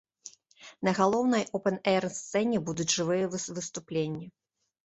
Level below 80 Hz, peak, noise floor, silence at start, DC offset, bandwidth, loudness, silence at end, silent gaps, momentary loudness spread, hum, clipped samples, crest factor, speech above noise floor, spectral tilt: -68 dBFS; -10 dBFS; -54 dBFS; 0.25 s; under 0.1%; 8.4 kHz; -29 LUFS; 0.55 s; none; 16 LU; none; under 0.1%; 20 dB; 26 dB; -4.5 dB/octave